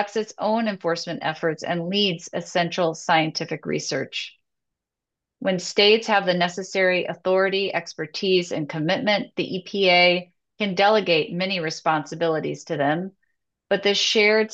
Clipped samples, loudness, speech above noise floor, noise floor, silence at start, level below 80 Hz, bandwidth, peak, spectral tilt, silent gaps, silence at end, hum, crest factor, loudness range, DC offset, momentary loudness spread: under 0.1%; -22 LUFS; 64 dB; -86 dBFS; 0 s; -74 dBFS; 8.4 kHz; -4 dBFS; -4 dB/octave; none; 0 s; none; 18 dB; 4 LU; under 0.1%; 11 LU